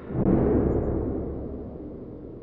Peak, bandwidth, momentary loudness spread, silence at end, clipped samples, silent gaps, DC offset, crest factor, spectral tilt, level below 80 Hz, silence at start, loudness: -8 dBFS; 3.3 kHz; 17 LU; 0 s; under 0.1%; none; under 0.1%; 18 dB; -13 dB/octave; -36 dBFS; 0 s; -26 LUFS